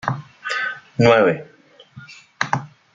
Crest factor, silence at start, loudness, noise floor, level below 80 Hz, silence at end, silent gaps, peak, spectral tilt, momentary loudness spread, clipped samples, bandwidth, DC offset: 20 dB; 0.05 s; -20 LUFS; -45 dBFS; -56 dBFS; 0.25 s; none; -2 dBFS; -6 dB/octave; 15 LU; under 0.1%; 8 kHz; under 0.1%